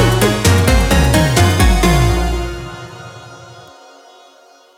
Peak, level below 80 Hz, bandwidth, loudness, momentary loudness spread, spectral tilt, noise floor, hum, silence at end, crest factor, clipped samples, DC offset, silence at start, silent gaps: 0 dBFS; -20 dBFS; 17 kHz; -13 LUFS; 20 LU; -5 dB/octave; -46 dBFS; none; 1.2 s; 14 dB; under 0.1%; under 0.1%; 0 s; none